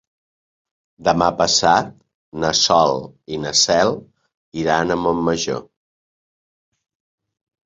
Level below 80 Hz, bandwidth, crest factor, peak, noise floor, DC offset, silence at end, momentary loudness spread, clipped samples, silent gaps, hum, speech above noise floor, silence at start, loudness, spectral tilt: -50 dBFS; 8.4 kHz; 20 dB; -2 dBFS; under -90 dBFS; under 0.1%; 2.05 s; 15 LU; under 0.1%; 2.14-2.32 s, 4.34-4.52 s; none; over 72 dB; 1 s; -17 LUFS; -3 dB/octave